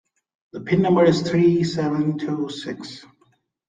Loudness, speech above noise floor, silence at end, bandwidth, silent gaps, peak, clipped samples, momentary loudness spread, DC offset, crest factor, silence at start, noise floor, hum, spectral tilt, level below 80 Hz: -20 LUFS; 43 dB; 0.65 s; 9.2 kHz; none; -4 dBFS; under 0.1%; 20 LU; under 0.1%; 18 dB; 0.55 s; -63 dBFS; none; -7 dB/octave; -58 dBFS